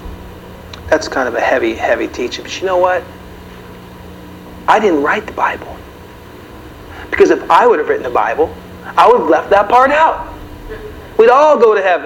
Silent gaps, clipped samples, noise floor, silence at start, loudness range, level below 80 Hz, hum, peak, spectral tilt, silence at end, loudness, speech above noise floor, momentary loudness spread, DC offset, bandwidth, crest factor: none; 0.2%; -34 dBFS; 0 s; 7 LU; -40 dBFS; none; 0 dBFS; -4.5 dB/octave; 0 s; -12 LUFS; 23 dB; 25 LU; under 0.1%; 17 kHz; 14 dB